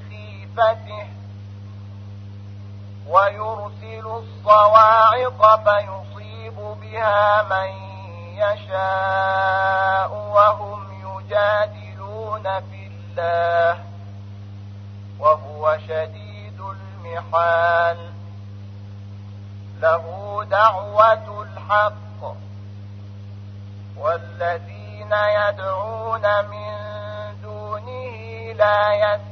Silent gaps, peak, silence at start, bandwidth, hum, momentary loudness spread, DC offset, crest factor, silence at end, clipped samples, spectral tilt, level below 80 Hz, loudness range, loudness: none; 0 dBFS; 0 s; 6.4 kHz; none; 22 LU; under 0.1%; 20 dB; 0 s; under 0.1%; -6.5 dB/octave; -58 dBFS; 9 LU; -19 LUFS